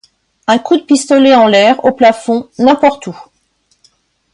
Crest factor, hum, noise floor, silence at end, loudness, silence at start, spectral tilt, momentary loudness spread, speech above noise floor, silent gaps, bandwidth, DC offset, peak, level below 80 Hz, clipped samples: 12 dB; none; -59 dBFS; 1.1 s; -10 LUFS; 0.5 s; -4 dB/octave; 11 LU; 49 dB; none; 11.5 kHz; under 0.1%; 0 dBFS; -54 dBFS; under 0.1%